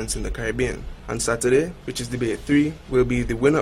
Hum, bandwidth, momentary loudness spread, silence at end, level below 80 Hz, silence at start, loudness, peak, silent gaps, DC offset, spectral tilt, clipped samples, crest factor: none; 15 kHz; 9 LU; 0 s; -36 dBFS; 0 s; -23 LUFS; -6 dBFS; none; under 0.1%; -5 dB/octave; under 0.1%; 16 dB